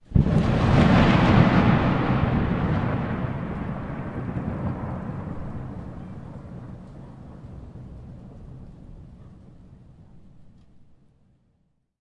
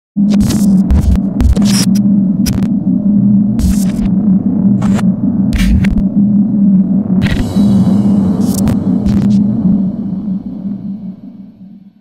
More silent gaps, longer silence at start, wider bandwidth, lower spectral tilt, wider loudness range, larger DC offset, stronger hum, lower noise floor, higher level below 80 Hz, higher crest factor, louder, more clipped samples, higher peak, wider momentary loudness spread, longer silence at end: neither; about the same, 0.1 s vs 0.15 s; second, 9 kHz vs 15 kHz; first, -8.5 dB/octave vs -7 dB/octave; first, 24 LU vs 2 LU; second, under 0.1% vs 0.5%; neither; first, -69 dBFS vs -35 dBFS; second, -36 dBFS vs -22 dBFS; first, 20 dB vs 10 dB; second, -23 LUFS vs -11 LUFS; neither; second, -4 dBFS vs 0 dBFS; first, 25 LU vs 9 LU; first, 1.55 s vs 0.1 s